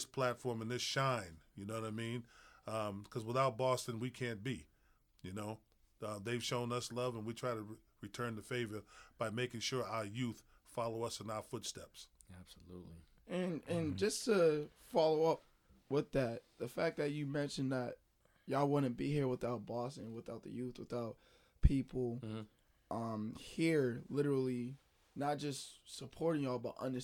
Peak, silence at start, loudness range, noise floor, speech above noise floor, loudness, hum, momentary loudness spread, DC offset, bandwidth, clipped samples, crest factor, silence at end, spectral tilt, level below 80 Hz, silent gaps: -14 dBFS; 0 s; 6 LU; -72 dBFS; 33 dB; -40 LUFS; none; 16 LU; under 0.1%; 18.5 kHz; under 0.1%; 26 dB; 0 s; -5.5 dB/octave; -54 dBFS; none